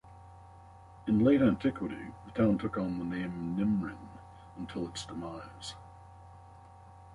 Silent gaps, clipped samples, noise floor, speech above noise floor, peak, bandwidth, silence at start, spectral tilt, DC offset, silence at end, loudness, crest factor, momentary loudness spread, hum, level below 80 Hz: none; under 0.1%; -53 dBFS; 22 dB; -14 dBFS; 11.5 kHz; 0.05 s; -7 dB/octave; under 0.1%; 0 s; -32 LUFS; 18 dB; 27 LU; none; -56 dBFS